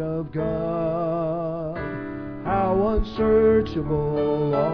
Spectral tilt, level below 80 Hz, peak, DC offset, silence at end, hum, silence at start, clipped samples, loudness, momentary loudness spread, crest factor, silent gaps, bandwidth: -10 dB/octave; -38 dBFS; -8 dBFS; 0.4%; 0 s; none; 0 s; under 0.1%; -24 LUFS; 11 LU; 14 dB; none; 5.4 kHz